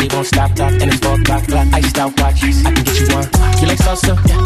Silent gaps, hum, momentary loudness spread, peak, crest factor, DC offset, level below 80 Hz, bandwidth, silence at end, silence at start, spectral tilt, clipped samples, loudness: none; none; 2 LU; -2 dBFS; 10 dB; under 0.1%; -16 dBFS; 14 kHz; 0 s; 0 s; -5 dB/octave; under 0.1%; -13 LUFS